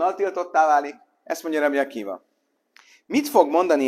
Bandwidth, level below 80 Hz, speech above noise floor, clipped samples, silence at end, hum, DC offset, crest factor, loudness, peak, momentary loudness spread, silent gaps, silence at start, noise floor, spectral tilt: 16 kHz; -76 dBFS; 40 dB; under 0.1%; 0 s; none; under 0.1%; 20 dB; -22 LUFS; -2 dBFS; 15 LU; none; 0 s; -61 dBFS; -3.5 dB/octave